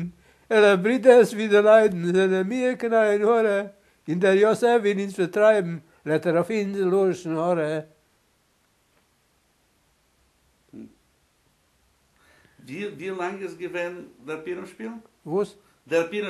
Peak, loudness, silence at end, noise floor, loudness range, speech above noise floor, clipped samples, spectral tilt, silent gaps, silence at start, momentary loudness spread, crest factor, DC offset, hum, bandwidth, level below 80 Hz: -4 dBFS; -22 LUFS; 0 s; -66 dBFS; 16 LU; 45 dB; under 0.1%; -6 dB/octave; none; 0 s; 18 LU; 20 dB; under 0.1%; none; 13 kHz; -70 dBFS